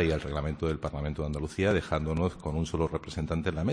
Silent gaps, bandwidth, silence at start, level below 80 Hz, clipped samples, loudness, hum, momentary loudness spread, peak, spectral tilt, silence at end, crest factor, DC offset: none; 10.5 kHz; 0 s; -40 dBFS; under 0.1%; -31 LUFS; none; 6 LU; -12 dBFS; -7 dB/octave; 0 s; 18 dB; under 0.1%